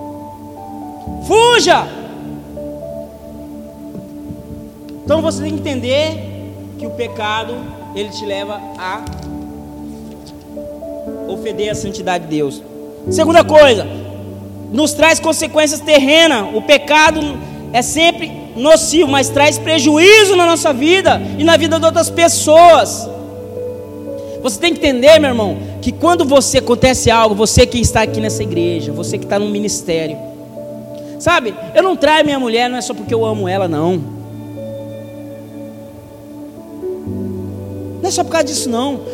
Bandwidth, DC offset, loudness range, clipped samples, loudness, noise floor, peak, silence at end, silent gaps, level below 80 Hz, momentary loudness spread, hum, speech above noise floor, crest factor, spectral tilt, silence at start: 16.5 kHz; under 0.1%; 15 LU; 0.4%; -12 LUFS; -34 dBFS; 0 dBFS; 0 s; none; -38 dBFS; 22 LU; none; 21 dB; 14 dB; -3.5 dB/octave; 0 s